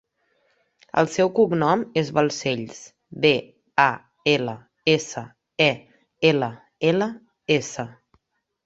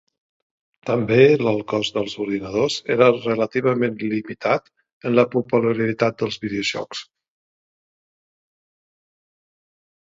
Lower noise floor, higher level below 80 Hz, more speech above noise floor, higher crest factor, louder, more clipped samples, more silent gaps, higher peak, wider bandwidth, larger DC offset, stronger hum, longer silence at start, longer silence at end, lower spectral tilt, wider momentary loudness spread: second, -71 dBFS vs under -90 dBFS; about the same, -64 dBFS vs -60 dBFS; second, 50 dB vs over 70 dB; about the same, 22 dB vs 22 dB; about the same, -22 LUFS vs -20 LUFS; neither; second, none vs 4.93-5.01 s; about the same, -2 dBFS vs 0 dBFS; about the same, 8 kHz vs 8 kHz; neither; neither; about the same, 0.95 s vs 0.85 s; second, 0.75 s vs 3.15 s; about the same, -5 dB/octave vs -6 dB/octave; first, 15 LU vs 11 LU